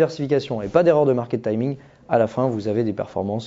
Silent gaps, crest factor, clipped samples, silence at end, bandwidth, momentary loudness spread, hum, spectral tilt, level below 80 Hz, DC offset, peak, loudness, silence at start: none; 18 dB; under 0.1%; 0 s; 7.8 kHz; 9 LU; none; -8 dB/octave; -56 dBFS; under 0.1%; -2 dBFS; -21 LUFS; 0 s